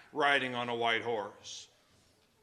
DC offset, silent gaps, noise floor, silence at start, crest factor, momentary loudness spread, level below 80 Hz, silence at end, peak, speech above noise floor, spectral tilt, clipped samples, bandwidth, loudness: under 0.1%; none; -68 dBFS; 0.15 s; 22 dB; 17 LU; -82 dBFS; 0.8 s; -12 dBFS; 35 dB; -3 dB/octave; under 0.1%; 12 kHz; -32 LUFS